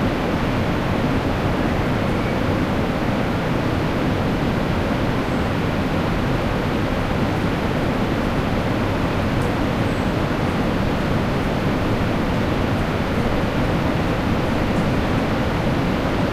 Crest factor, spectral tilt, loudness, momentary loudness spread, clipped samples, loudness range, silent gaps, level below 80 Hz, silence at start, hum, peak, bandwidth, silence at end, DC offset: 12 dB; -7 dB/octave; -21 LUFS; 1 LU; under 0.1%; 1 LU; none; -30 dBFS; 0 s; none; -6 dBFS; 15.5 kHz; 0 s; under 0.1%